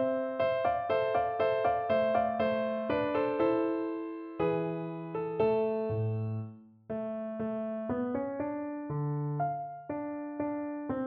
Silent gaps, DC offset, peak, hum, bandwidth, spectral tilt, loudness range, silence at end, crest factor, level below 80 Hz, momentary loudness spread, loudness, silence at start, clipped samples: none; under 0.1%; -16 dBFS; none; 5.2 kHz; -10.5 dB/octave; 6 LU; 0 s; 14 dB; -64 dBFS; 9 LU; -32 LUFS; 0 s; under 0.1%